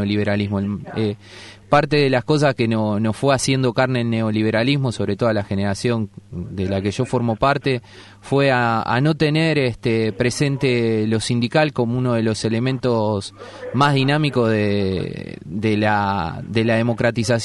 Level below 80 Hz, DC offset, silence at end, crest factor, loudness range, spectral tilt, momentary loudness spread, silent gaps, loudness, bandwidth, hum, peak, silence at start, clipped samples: -48 dBFS; under 0.1%; 0 s; 16 dB; 3 LU; -6 dB/octave; 8 LU; none; -19 LUFS; 11.5 kHz; none; -2 dBFS; 0 s; under 0.1%